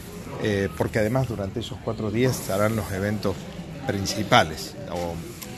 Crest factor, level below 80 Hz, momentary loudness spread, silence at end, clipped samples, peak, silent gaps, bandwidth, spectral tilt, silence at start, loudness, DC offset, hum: 26 dB; -46 dBFS; 13 LU; 0 s; under 0.1%; 0 dBFS; none; 13 kHz; -5 dB/octave; 0 s; -25 LUFS; under 0.1%; none